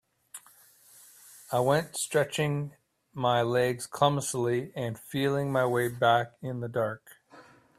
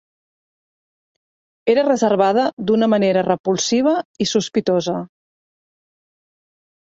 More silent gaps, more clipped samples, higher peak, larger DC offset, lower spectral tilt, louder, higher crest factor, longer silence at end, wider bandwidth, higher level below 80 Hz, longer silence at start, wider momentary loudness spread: second, none vs 2.53-2.57 s, 3.40-3.44 s, 4.05-4.14 s; neither; second, -8 dBFS vs -4 dBFS; neither; about the same, -5 dB/octave vs -4.5 dB/octave; second, -28 LUFS vs -18 LUFS; first, 22 dB vs 16 dB; second, 0.35 s vs 1.85 s; first, 16 kHz vs 7.8 kHz; about the same, -66 dBFS vs -62 dBFS; second, 0.35 s vs 1.65 s; first, 19 LU vs 6 LU